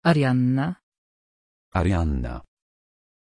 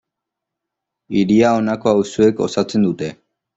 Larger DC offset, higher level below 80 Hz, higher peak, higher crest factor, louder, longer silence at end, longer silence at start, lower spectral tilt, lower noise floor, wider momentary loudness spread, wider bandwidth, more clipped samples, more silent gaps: neither; first, -36 dBFS vs -56 dBFS; second, -6 dBFS vs -2 dBFS; about the same, 18 dB vs 16 dB; second, -24 LUFS vs -17 LUFS; first, 0.95 s vs 0.45 s; second, 0.05 s vs 1.1 s; first, -8 dB/octave vs -6.5 dB/octave; first, under -90 dBFS vs -82 dBFS; first, 16 LU vs 8 LU; first, 10.5 kHz vs 8 kHz; neither; first, 0.83-0.92 s, 0.98-1.72 s vs none